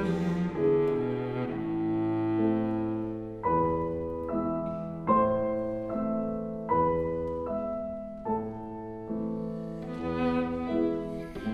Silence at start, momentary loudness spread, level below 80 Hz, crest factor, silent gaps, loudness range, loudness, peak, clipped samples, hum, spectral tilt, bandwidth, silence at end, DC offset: 0 s; 10 LU; -52 dBFS; 18 dB; none; 4 LU; -30 LUFS; -12 dBFS; under 0.1%; none; -9.5 dB/octave; 7.4 kHz; 0 s; under 0.1%